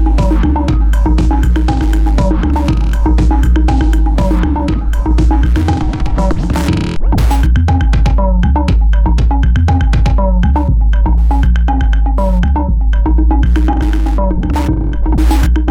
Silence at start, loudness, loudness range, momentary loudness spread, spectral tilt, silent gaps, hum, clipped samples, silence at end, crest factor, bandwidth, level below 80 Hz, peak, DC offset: 0 s; -13 LUFS; 1 LU; 3 LU; -7.5 dB/octave; none; none; under 0.1%; 0 s; 6 dB; 8.4 kHz; -10 dBFS; -2 dBFS; under 0.1%